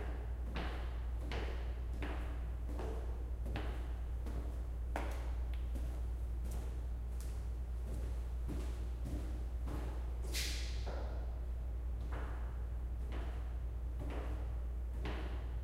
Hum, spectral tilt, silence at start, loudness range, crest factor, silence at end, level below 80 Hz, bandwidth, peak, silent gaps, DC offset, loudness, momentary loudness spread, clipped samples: none; -5.5 dB/octave; 0 s; 1 LU; 16 dB; 0 s; -40 dBFS; 15 kHz; -24 dBFS; none; under 0.1%; -43 LUFS; 2 LU; under 0.1%